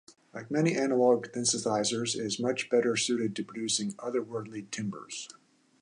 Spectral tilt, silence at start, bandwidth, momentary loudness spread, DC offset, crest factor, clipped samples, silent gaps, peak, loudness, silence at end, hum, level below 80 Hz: -3.5 dB/octave; 0.1 s; 11.5 kHz; 13 LU; under 0.1%; 20 dB; under 0.1%; none; -12 dBFS; -30 LUFS; 0.55 s; none; -76 dBFS